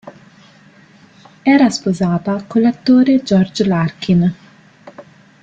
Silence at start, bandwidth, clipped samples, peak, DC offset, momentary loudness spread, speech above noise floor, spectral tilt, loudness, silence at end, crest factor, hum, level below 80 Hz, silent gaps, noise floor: 0.05 s; 8.8 kHz; under 0.1%; -2 dBFS; under 0.1%; 6 LU; 32 dB; -6.5 dB/octave; -14 LUFS; 0.4 s; 14 dB; none; -52 dBFS; none; -46 dBFS